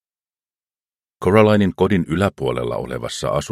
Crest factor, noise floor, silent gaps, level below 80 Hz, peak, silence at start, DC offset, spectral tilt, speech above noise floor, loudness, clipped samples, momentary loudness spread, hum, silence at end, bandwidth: 20 dB; under -90 dBFS; none; -44 dBFS; 0 dBFS; 1.2 s; under 0.1%; -6.5 dB/octave; over 72 dB; -18 LUFS; under 0.1%; 11 LU; none; 0 s; 14 kHz